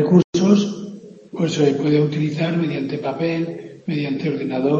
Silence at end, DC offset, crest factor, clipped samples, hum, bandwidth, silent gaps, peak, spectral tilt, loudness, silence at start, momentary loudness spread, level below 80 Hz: 0 s; under 0.1%; 18 dB; under 0.1%; none; 7.6 kHz; 0.24-0.33 s; -2 dBFS; -7 dB/octave; -20 LUFS; 0 s; 14 LU; -62 dBFS